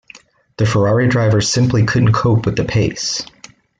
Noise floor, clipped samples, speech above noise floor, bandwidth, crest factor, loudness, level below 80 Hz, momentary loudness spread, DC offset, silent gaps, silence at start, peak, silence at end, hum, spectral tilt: -44 dBFS; under 0.1%; 30 dB; 9.2 kHz; 12 dB; -15 LUFS; -40 dBFS; 7 LU; under 0.1%; none; 0.15 s; -4 dBFS; 0.55 s; none; -5.5 dB/octave